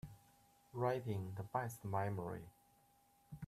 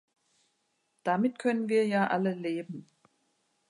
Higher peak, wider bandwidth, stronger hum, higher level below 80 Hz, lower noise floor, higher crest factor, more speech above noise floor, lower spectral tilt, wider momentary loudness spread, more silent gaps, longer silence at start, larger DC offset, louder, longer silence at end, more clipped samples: second, -24 dBFS vs -14 dBFS; first, 14.5 kHz vs 11 kHz; neither; first, -72 dBFS vs -82 dBFS; about the same, -73 dBFS vs -76 dBFS; about the same, 20 dB vs 16 dB; second, 31 dB vs 48 dB; about the same, -7 dB/octave vs -7 dB/octave; first, 17 LU vs 10 LU; neither; second, 0.05 s vs 1.05 s; neither; second, -43 LUFS vs -29 LUFS; second, 0 s vs 0.85 s; neither